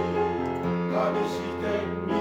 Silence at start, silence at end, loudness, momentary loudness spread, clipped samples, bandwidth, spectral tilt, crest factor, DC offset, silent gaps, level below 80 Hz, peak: 0 s; 0 s; -28 LUFS; 3 LU; under 0.1%; 13.5 kHz; -7 dB/octave; 14 dB; under 0.1%; none; -54 dBFS; -14 dBFS